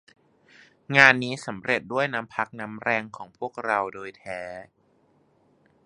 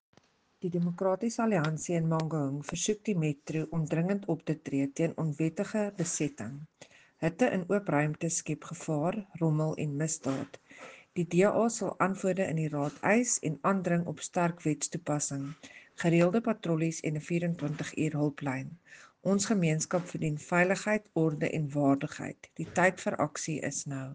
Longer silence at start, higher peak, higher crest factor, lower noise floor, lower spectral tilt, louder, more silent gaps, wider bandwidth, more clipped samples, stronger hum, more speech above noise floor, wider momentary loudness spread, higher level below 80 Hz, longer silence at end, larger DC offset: first, 0.9 s vs 0.6 s; first, 0 dBFS vs -10 dBFS; first, 28 dB vs 20 dB; about the same, -64 dBFS vs -65 dBFS; about the same, -4.5 dB/octave vs -5.5 dB/octave; first, -23 LUFS vs -31 LUFS; neither; first, 11.5 kHz vs 10 kHz; neither; neither; first, 38 dB vs 34 dB; first, 20 LU vs 10 LU; about the same, -68 dBFS vs -68 dBFS; first, 1.25 s vs 0 s; neither